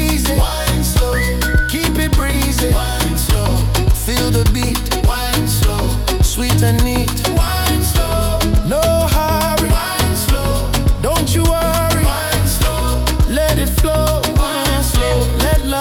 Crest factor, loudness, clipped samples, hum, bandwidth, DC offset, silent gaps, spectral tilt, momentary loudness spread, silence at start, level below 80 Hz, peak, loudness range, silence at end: 12 dB; -15 LUFS; under 0.1%; none; 18 kHz; under 0.1%; none; -4.5 dB/octave; 2 LU; 0 s; -18 dBFS; -2 dBFS; 1 LU; 0 s